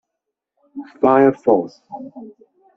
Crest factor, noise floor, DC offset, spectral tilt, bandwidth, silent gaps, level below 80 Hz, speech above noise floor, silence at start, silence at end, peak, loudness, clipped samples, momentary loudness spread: 18 dB; -80 dBFS; under 0.1%; -7 dB/octave; 6.4 kHz; none; -62 dBFS; 63 dB; 0.75 s; 0.5 s; -2 dBFS; -16 LUFS; under 0.1%; 23 LU